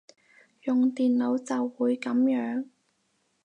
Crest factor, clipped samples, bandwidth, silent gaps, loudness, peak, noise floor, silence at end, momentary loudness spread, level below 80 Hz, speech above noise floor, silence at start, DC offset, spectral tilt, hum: 12 dB; under 0.1%; 9.2 kHz; none; -27 LUFS; -16 dBFS; -73 dBFS; 0.8 s; 10 LU; -84 dBFS; 47 dB; 0.65 s; under 0.1%; -5.5 dB/octave; none